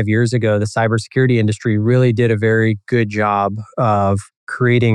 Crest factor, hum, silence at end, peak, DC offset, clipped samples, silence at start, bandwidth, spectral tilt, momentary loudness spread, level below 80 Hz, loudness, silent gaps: 12 dB; none; 0 s; -4 dBFS; under 0.1%; under 0.1%; 0 s; 10.5 kHz; -7.5 dB/octave; 5 LU; -56 dBFS; -16 LUFS; 4.37-4.47 s